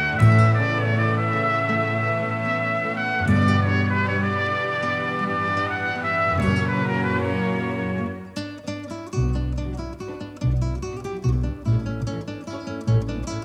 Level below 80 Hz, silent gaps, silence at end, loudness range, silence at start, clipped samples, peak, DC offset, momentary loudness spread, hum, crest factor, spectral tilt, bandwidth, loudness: -36 dBFS; none; 0 s; 6 LU; 0 s; under 0.1%; -4 dBFS; under 0.1%; 13 LU; none; 18 dB; -7 dB/octave; 10 kHz; -23 LUFS